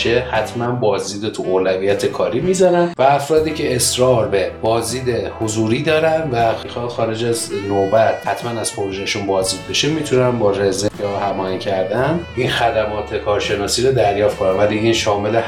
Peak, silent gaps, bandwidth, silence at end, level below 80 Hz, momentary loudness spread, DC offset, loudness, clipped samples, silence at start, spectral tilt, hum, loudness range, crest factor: 0 dBFS; none; 17 kHz; 0 s; -42 dBFS; 7 LU; 0.1%; -17 LUFS; under 0.1%; 0 s; -4.5 dB/octave; none; 3 LU; 16 dB